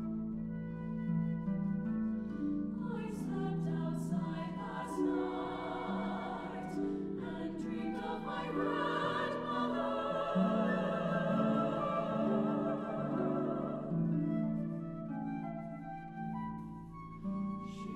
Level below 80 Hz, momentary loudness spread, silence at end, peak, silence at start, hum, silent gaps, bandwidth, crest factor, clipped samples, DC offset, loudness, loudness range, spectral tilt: -60 dBFS; 8 LU; 0 s; -20 dBFS; 0 s; none; none; 11 kHz; 16 dB; under 0.1%; under 0.1%; -37 LUFS; 5 LU; -8 dB/octave